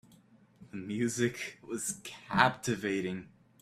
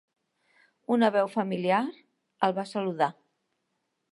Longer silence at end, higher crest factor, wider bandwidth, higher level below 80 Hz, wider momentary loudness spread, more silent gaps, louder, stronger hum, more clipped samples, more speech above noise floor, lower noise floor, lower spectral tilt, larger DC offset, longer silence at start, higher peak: second, 0.35 s vs 1 s; first, 28 dB vs 20 dB; first, 15.5 kHz vs 11.5 kHz; first, -66 dBFS vs -84 dBFS; first, 15 LU vs 8 LU; neither; second, -33 LUFS vs -28 LUFS; neither; neither; second, 29 dB vs 53 dB; second, -62 dBFS vs -79 dBFS; second, -4 dB/octave vs -6.5 dB/octave; neither; second, 0.6 s vs 0.9 s; about the same, -8 dBFS vs -8 dBFS